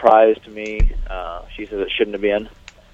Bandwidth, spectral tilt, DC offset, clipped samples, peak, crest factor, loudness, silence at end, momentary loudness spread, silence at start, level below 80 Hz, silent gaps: 7.4 kHz; -6.5 dB/octave; under 0.1%; under 0.1%; 0 dBFS; 18 dB; -20 LUFS; 0.45 s; 16 LU; 0 s; -26 dBFS; none